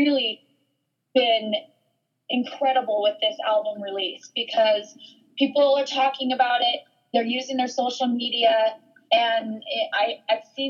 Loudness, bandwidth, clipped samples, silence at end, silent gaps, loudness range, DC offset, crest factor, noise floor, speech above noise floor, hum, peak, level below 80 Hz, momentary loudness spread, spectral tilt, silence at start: -23 LUFS; 7.4 kHz; under 0.1%; 0 s; none; 2 LU; under 0.1%; 18 dB; -75 dBFS; 52 dB; none; -6 dBFS; -88 dBFS; 8 LU; -3 dB/octave; 0 s